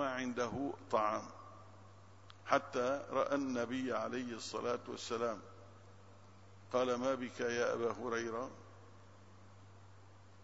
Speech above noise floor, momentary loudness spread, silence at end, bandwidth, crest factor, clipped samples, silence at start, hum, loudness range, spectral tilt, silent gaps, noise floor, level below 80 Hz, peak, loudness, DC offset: 23 dB; 23 LU; 0 s; 7.6 kHz; 26 dB; under 0.1%; 0 s; none; 3 LU; -3.5 dB/octave; none; -60 dBFS; -74 dBFS; -14 dBFS; -38 LUFS; under 0.1%